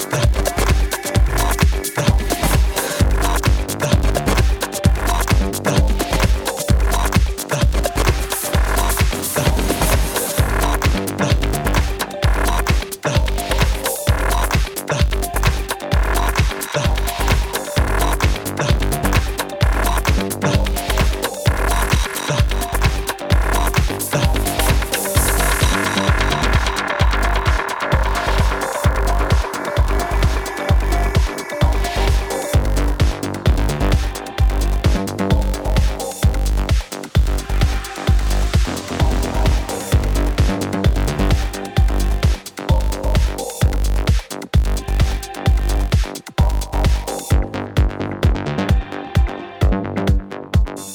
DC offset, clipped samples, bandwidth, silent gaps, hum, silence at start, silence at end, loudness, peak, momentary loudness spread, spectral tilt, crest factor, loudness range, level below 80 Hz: under 0.1%; under 0.1%; 18.5 kHz; none; none; 0 s; 0 s; -19 LUFS; 0 dBFS; 3 LU; -4.5 dB/octave; 16 dB; 2 LU; -20 dBFS